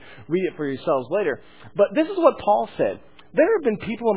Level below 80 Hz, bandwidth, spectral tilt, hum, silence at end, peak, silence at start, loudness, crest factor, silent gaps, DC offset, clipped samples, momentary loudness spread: -58 dBFS; 4 kHz; -10 dB/octave; none; 0 s; -2 dBFS; 0.05 s; -22 LUFS; 20 dB; none; 0.4%; under 0.1%; 8 LU